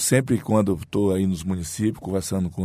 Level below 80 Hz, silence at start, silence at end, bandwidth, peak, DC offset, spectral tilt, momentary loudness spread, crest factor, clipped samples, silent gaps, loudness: -50 dBFS; 0 s; 0 s; 15.5 kHz; -4 dBFS; under 0.1%; -5.5 dB/octave; 6 LU; 18 dB; under 0.1%; none; -23 LUFS